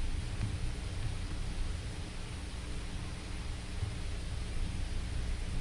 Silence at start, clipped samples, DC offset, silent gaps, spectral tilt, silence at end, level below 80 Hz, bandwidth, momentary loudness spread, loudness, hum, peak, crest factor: 0 s; under 0.1%; under 0.1%; none; -5 dB/octave; 0 s; -38 dBFS; 11.5 kHz; 4 LU; -41 LUFS; none; -22 dBFS; 14 dB